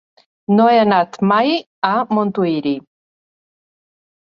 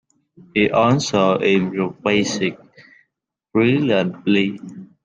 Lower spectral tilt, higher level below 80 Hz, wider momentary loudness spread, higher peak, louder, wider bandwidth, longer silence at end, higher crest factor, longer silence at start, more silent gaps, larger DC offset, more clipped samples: first, -7.5 dB/octave vs -5.5 dB/octave; second, -64 dBFS vs -56 dBFS; about the same, 10 LU vs 8 LU; about the same, -2 dBFS vs -4 dBFS; about the same, -16 LUFS vs -18 LUFS; second, 7 kHz vs 9.6 kHz; first, 1.55 s vs 0.2 s; about the same, 16 dB vs 16 dB; about the same, 0.5 s vs 0.55 s; first, 1.66-1.82 s vs none; neither; neither